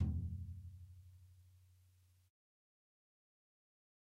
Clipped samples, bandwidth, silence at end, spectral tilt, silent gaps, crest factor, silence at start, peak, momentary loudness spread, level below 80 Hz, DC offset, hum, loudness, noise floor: under 0.1%; 3.3 kHz; 2.3 s; -9.5 dB/octave; none; 22 dB; 0 s; -26 dBFS; 24 LU; -56 dBFS; under 0.1%; none; -47 LUFS; -71 dBFS